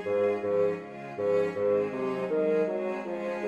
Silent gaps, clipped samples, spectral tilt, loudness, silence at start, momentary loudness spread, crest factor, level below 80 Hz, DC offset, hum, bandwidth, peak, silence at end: none; under 0.1%; -7.5 dB/octave; -29 LUFS; 0 s; 6 LU; 12 dB; -72 dBFS; under 0.1%; none; 8.6 kHz; -16 dBFS; 0 s